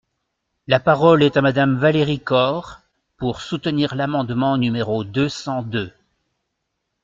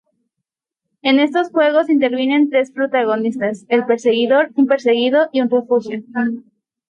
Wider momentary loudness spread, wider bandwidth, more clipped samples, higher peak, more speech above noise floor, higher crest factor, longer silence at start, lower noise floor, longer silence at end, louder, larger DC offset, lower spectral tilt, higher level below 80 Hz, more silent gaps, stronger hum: first, 12 LU vs 7 LU; second, 7.6 kHz vs 8.8 kHz; neither; about the same, -2 dBFS vs -2 dBFS; second, 58 dB vs 66 dB; about the same, 18 dB vs 14 dB; second, 0.7 s vs 1.05 s; second, -76 dBFS vs -81 dBFS; first, 1.15 s vs 0.5 s; second, -19 LUFS vs -16 LUFS; neither; first, -7 dB/octave vs -5.5 dB/octave; first, -52 dBFS vs -70 dBFS; neither; neither